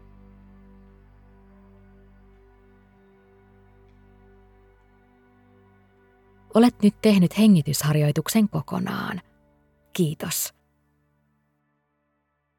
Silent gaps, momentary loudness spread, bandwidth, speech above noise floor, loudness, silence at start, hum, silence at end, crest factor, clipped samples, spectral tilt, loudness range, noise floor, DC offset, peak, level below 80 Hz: none; 13 LU; 18 kHz; 53 dB; -22 LUFS; 6.55 s; none; 2.1 s; 22 dB; under 0.1%; -6 dB/octave; 11 LU; -73 dBFS; under 0.1%; -4 dBFS; -58 dBFS